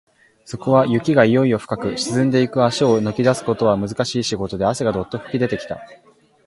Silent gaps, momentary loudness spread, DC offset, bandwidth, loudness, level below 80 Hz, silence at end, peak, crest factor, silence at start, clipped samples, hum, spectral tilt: none; 10 LU; under 0.1%; 11.5 kHz; -19 LUFS; -50 dBFS; 0.5 s; 0 dBFS; 18 dB; 0.5 s; under 0.1%; none; -6 dB/octave